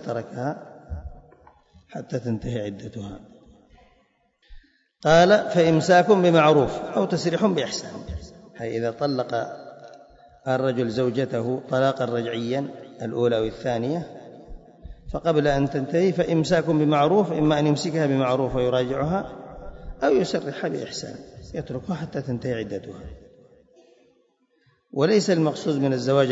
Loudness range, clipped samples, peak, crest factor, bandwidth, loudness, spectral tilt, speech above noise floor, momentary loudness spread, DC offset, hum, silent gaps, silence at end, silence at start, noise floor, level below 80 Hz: 14 LU; under 0.1%; -6 dBFS; 18 dB; 8 kHz; -23 LUFS; -6 dB/octave; 43 dB; 21 LU; under 0.1%; none; none; 0 s; 0 s; -65 dBFS; -48 dBFS